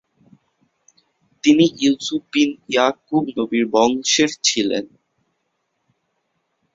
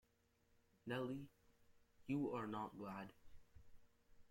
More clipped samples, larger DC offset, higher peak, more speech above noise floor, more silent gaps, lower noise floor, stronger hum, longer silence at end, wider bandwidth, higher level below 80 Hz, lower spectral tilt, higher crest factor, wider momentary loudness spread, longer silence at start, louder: neither; neither; first, -2 dBFS vs -32 dBFS; first, 54 dB vs 33 dB; neither; second, -72 dBFS vs -80 dBFS; neither; first, 1.9 s vs 0.05 s; second, 7.8 kHz vs 16.5 kHz; first, -62 dBFS vs -74 dBFS; second, -3 dB/octave vs -7.5 dB/octave; about the same, 20 dB vs 18 dB; second, 8 LU vs 15 LU; first, 1.45 s vs 0.85 s; first, -18 LUFS vs -48 LUFS